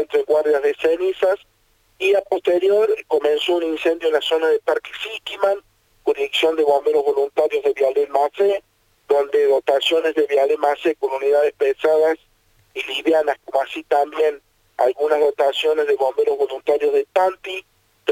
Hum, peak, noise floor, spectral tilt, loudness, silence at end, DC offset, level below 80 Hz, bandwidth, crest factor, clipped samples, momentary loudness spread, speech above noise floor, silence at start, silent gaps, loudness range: none; -2 dBFS; -56 dBFS; -3 dB/octave; -19 LUFS; 0 s; under 0.1%; -64 dBFS; 16 kHz; 16 dB; under 0.1%; 7 LU; 37 dB; 0 s; none; 2 LU